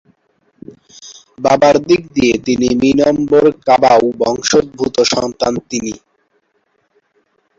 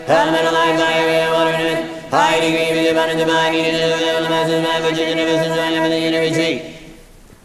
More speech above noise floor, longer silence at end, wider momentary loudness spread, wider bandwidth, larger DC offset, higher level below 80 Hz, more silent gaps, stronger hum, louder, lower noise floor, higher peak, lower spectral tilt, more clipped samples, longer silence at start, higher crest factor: first, 50 dB vs 26 dB; first, 1.65 s vs 0.4 s; first, 10 LU vs 4 LU; second, 7.8 kHz vs 15 kHz; neither; about the same, -46 dBFS vs -50 dBFS; neither; neither; first, -13 LUFS vs -16 LUFS; first, -62 dBFS vs -42 dBFS; about the same, 0 dBFS vs -2 dBFS; about the same, -4 dB/octave vs -4 dB/octave; neither; first, 1.05 s vs 0 s; about the same, 14 dB vs 14 dB